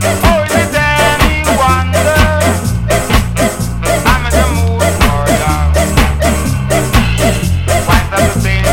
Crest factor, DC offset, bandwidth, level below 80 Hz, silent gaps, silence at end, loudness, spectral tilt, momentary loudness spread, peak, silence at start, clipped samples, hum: 10 dB; under 0.1%; 17 kHz; -18 dBFS; none; 0 s; -11 LUFS; -4.5 dB/octave; 4 LU; 0 dBFS; 0 s; 0.3%; none